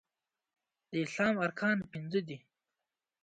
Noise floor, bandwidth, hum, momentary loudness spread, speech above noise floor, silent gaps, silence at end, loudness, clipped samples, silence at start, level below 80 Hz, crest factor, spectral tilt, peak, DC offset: under -90 dBFS; 9.2 kHz; none; 11 LU; over 57 dB; none; 0.85 s; -34 LUFS; under 0.1%; 0.9 s; -76 dBFS; 20 dB; -6 dB/octave; -18 dBFS; under 0.1%